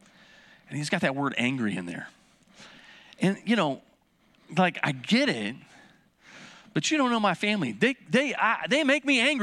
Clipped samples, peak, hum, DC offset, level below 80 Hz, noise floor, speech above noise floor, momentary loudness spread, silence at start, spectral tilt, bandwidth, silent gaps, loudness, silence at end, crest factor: under 0.1%; -8 dBFS; none; under 0.1%; -74 dBFS; -64 dBFS; 38 dB; 15 LU; 0.7 s; -4.5 dB/octave; 12 kHz; none; -26 LUFS; 0 s; 20 dB